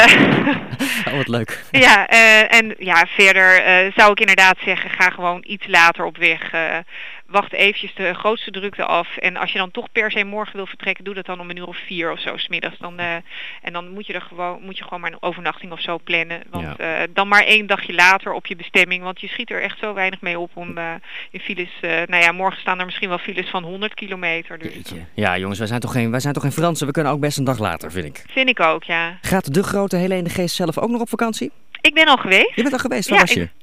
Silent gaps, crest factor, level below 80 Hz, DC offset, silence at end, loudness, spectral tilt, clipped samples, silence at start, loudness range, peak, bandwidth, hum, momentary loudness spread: none; 18 dB; -50 dBFS; 1%; 0.15 s; -16 LUFS; -3.5 dB/octave; under 0.1%; 0 s; 14 LU; 0 dBFS; 15.5 kHz; none; 17 LU